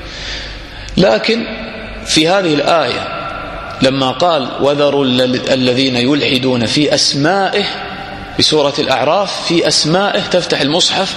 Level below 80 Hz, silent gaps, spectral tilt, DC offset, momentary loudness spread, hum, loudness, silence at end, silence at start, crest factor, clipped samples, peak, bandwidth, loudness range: -38 dBFS; none; -4 dB/octave; under 0.1%; 12 LU; none; -13 LUFS; 0 s; 0 s; 14 dB; under 0.1%; 0 dBFS; 13.5 kHz; 2 LU